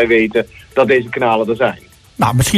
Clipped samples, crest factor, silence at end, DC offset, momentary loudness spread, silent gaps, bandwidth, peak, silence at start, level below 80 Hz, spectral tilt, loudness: under 0.1%; 12 dB; 0 s; under 0.1%; 7 LU; none; 14.5 kHz; -2 dBFS; 0 s; -38 dBFS; -5 dB/octave; -15 LUFS